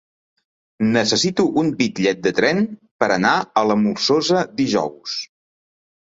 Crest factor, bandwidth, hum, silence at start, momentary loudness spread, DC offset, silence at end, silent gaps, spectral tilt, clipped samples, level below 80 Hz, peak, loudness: 18 dB; 7.8 kHz; none; 0.8 s; 9 LU; under 0.1%; 0.8 s; 2.91-2.99 s; -4.5 dB/octave; under 0.1%; -58 dBFS; -2 dBFS; -19 LUFS